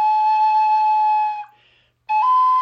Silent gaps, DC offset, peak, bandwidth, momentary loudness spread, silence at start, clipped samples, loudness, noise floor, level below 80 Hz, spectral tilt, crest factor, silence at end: none; under 0.1%; -10 dBFS; 6.2 kHz; 8 LU; 0 s; under 0.1%; -17 LUFS; -58 dBFS; -76 dBFS; 0.5 dB/octave; 8 dB; 0 s